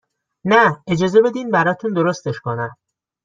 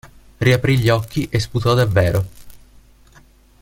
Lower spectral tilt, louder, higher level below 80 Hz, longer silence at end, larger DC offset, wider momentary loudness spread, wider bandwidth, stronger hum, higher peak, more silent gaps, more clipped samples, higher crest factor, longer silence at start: about the same, -6 dB/octave vs -6.5 dB/octave; about the same, -17 LUFS vs -17 LUFS; second, -58 dBFS vs -40 dBFS; second, 0.5 s vs 1.05 s; neither; first, 12 LU vs 6 LU; second, 7.6 kHz vs 16.5 kHz; neither; about the same, -2 dBFS vs -2 dBFS; neither; neither; about the same, 16 dB vs 18 dB; first, 0.45 s vs 0.05 s